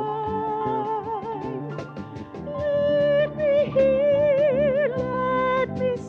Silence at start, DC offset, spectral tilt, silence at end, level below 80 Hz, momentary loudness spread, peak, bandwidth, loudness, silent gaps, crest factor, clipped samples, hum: 0 s; under 0.1%; -8 dB/octave; 0 s; -52 dBFS; 14 LU; -10 dBFS; 6.6 kHz; -23 LUFS; none; 12 dB; under 0.1%; none